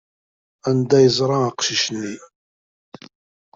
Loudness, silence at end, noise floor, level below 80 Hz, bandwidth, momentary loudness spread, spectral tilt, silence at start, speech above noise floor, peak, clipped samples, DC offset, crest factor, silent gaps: -18 LUFS; 1.3 s; under -90 dBFS; -60 dBFS; 7.8 kHz; 15 LU; -4.5 dB/octave; 0.65 s; over 72 dB; -4 dBFS; under 0.1%; under 0.1%; 18 dB; none